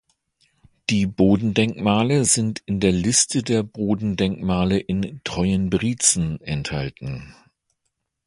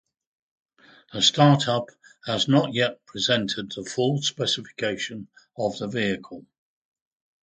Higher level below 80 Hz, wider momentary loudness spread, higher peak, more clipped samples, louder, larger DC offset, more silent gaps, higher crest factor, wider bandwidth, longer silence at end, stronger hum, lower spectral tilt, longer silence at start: first, -44 dBFS vs -64 dBFS; second, 10 LU vs 20 LU; about the same, -2 dBFS vs -4 dBFS; neither; first, -21 LUFS vs -24 LUFS; neither; neither; about the same, 20 dB vs 22 dB; first, 11.5 kHz vs 9.4 kHz; about the same, 0.95 s vs 1.05 s; neither; about the same, -4.5 dB/octave vs -4.5 dB/octave; second, 0.9 s vs 1.1 s